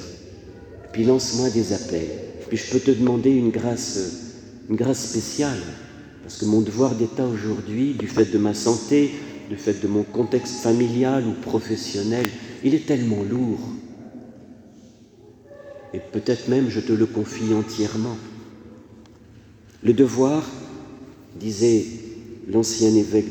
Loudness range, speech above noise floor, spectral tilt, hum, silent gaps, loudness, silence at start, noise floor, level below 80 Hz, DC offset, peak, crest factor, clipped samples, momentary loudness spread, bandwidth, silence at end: 5 LU; 27 dB; -5.5 dB/octave; none; none; -22 LUFS; 0 s; -48 dBFS; -56 dBFS; under 0.1%; -2 dBFS; 22 dB; under 0.1%; 21 LU; 20 kHz; 0 s